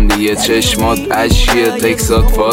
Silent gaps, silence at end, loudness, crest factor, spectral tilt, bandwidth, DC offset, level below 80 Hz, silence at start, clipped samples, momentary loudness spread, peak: none; 0 s; -12 LUFS; 10 dB; -4 dB/octave; 17 kHz; under 0.1%; -16 dBFS; 0 s; under 0.1%; 3 LU; 0 dBFS